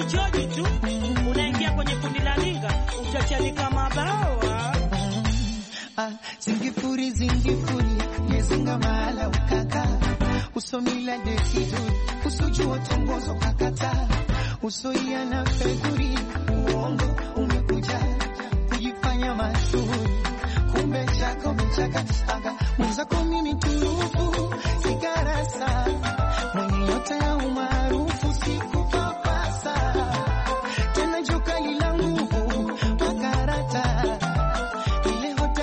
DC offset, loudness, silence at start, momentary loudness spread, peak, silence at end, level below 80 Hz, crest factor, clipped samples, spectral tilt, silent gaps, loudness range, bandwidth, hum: under 0.1%; -25 LUFS; 0 s; 3 LU; -12 dBFS; 0 s; -28 dBFS; 10 dB; under 0.1%; -5.5 dB/octave; none; 1 LU; 8.8 kHz; none